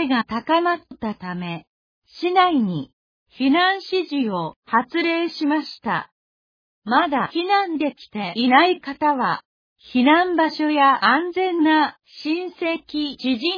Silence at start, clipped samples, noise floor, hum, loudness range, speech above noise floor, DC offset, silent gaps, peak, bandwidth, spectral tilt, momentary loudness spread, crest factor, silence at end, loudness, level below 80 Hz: 0 s; under 0.1%; under -90 dBFS; none; 4 LU; over 70 dB; under 0.1%; 1.67-2.02 s, 2.93-3.26 s, 4.56-4.62 s, 6.12-6.82 s, 9.45-9.76 s; 0 dBFS; 5.2 kHz; -6.5 dB/octave; 13 LU; 20 dB; 0 s; -20 LUFS; -64 dBFS